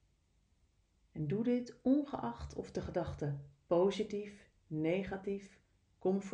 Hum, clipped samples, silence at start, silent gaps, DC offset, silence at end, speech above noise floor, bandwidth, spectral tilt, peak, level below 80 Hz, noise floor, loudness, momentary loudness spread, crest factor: none; under 0.1%; 1.15 s; none; under 0.1%; 0 s; 38 dB; 9.4 kHz; -7.5 dB/octave; -20 dBFS; -60 dBFS; -74 dBFS; -38 LUFS; 12 LU; 18 dB